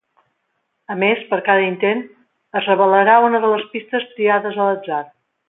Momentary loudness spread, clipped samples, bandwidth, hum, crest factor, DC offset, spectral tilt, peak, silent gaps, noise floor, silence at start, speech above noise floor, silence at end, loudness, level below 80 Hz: 13 LU; under 0.1%; 4 kHz; none; 16 dB; under 0.1%; -9.5 dB/octave; -2 dBFS; none; -71 dBFS; 0.9 s; 55 dB; 0.45 s; -17 LUFS; -70 dBFS